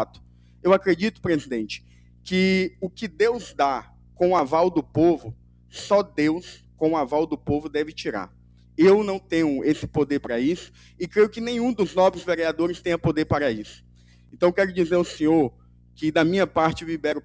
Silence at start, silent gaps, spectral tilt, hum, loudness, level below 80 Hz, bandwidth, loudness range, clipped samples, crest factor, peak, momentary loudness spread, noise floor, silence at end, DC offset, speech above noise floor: 0 s; none; -6.5 dB/octave; 60 Hz at -50 dBFS; -23 LUFS; -50 dBFS; 8 kHz; 2 LU; under 0.1%; 20 dB; -4 dBFS; 12 LU; -51 dBFS; 0.05 s; under 0.1%; 28 dB